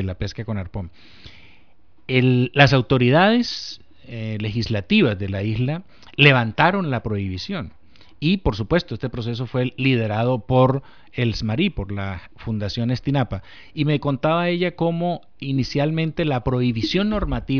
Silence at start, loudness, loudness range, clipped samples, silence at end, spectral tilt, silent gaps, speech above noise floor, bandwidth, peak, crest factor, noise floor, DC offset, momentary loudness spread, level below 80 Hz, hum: 0 s; -21 LUFS; 4 LU; under 0.1%; 0 s; -7 dB/octave; none; 38 dB; 5.4 kHz; -2 dBFS; 20 dB; -58 dBFS; 0.6%; 15 LU; -40 dBFS; none